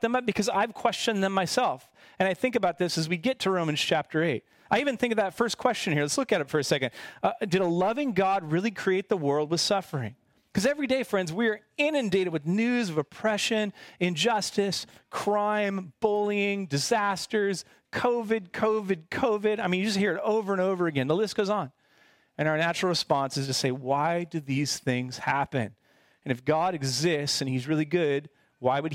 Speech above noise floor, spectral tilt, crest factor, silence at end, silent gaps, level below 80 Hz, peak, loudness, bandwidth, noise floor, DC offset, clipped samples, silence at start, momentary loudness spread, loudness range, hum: 35 dB; -4.5 dB/octave; 18 dB; 0 s; none; -66 dBFS; -8 dBFS; -27 LUFS; 16.5 kHz; -62 dBFS; under 0.1%; under 0.1%; 0 s; 5 LU; 1 LU; none